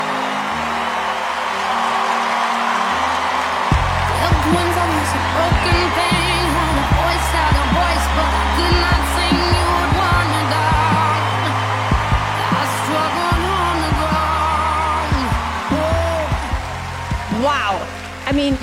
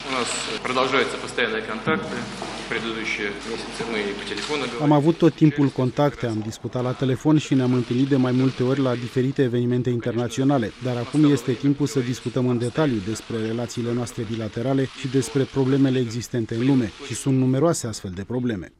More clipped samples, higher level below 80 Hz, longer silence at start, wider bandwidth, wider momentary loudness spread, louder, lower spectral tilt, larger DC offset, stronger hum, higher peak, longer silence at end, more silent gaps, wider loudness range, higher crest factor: neither; first, -26 dBFS vs -52 dBFS; about the same, 0 s vs 0 s; first, 16.5 kHz vs 14 kHz; second, 5 LU vs 9 LU; first, -17 LUFS vs -23 LUFS; about the same, -5 dB/octave vs -6 dB/octave; neither; neither; about the same, -2 dBFS vs -4 dBFS; about the same, 0 s vs 0.1 s; neither; about the same, 3 LU vs 4 LU; about the same, 16 dB vs 18 dB